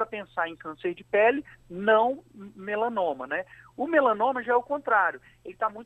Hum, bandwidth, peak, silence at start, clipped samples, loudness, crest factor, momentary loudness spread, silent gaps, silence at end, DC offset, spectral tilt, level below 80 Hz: none; 8.4 kHz; -10 dBFS; 0 s; under 0.1%; -26 LUFS; 18 dB; 14 LU; none; 0 s; under 0.1%; -6.5 dB/octave; -66 dBFS